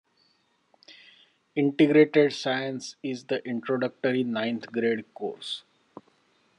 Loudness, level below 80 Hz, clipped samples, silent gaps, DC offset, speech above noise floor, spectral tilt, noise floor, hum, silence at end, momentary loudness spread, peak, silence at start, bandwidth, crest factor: -26 LUFS; -80 dBFS; under 0.1%; none; under 0.1%; 43 dB; -6 dB/octave; -69 dBFS; none; 1 s; 15 LU; -8 dBFS; 0.9 s; 10.5 kHz; 20 dB